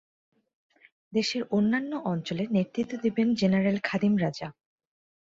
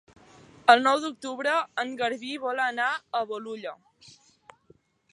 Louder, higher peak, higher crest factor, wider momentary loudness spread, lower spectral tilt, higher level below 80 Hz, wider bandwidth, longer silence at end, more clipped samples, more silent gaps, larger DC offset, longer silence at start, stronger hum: about the same, -27 LUFS vs -26 LUFS; second, -12 dBFS vs -2 dBFS; second, 16 dB vs 26 dB; second, 7 LU vs 15 LU; first, -6.5 dB/octave vs -2.5 dB/octave; first, -66 dBFS vs -76 dBFS; second, 7.8 kHz vs 11.5 kHz; second, 0.9 s vs 1.05 s; neither; neither; neither; first, 1.1 s vs 0.65 s; neither